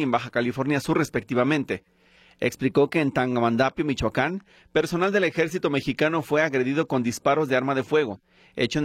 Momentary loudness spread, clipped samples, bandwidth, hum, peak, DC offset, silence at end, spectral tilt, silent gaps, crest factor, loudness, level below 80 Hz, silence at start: 6 LU; under 0.1%; 15.5 kHz; none; -10 dBFS; under 0.1%; 0 s; -6 dB/octave; none; 16 dB; -24 LUFS; -54 dBFS; 0 s